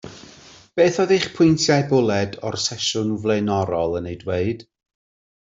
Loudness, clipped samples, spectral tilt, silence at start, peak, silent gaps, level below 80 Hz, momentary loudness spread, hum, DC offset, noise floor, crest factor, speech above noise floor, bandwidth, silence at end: -20 LUFS; under 0.1%; -5 dB/octave; 0.05 s; -4 dBFS; none; -54 dBFS; 10 LU; none; under 0.1%; -46 dBFS; 18 dB; 27 dB; 8 kHz; 0.8 s